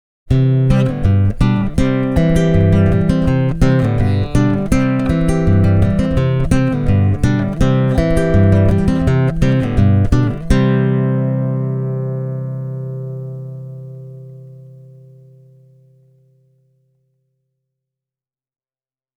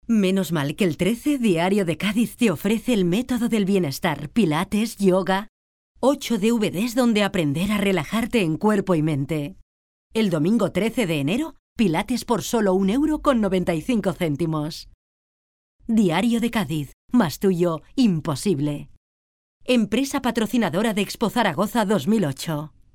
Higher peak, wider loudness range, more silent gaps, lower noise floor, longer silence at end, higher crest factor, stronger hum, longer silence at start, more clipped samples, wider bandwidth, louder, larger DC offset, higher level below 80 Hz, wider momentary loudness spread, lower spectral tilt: first, 0 dBFS vs -4 dBFS; first, 13 LU vs 2 LU; second, none vs 5.49-5.95 s, 9.62-10.10 s, 11.59-11.76 s, 14.94-15.79 s, 16.93-17.08 s, 18.97-19.61 s; about the same, under -90 dBFS vs under -90 dBFS; first, 4.6 s vs 0.25 s; about the same, 14 dB vs 18 dB; neither; first, 0.25 s vs 0.1 s; neither; second, 11.5 kHz vs 18 kHz; first, -15 LUFS vs -22 LUFS; neither; first, -26 dBFS vs -48 dBFS; first, 12 LU vs 5 LU; first, -8.5 dB/octave vs -6 dB/octave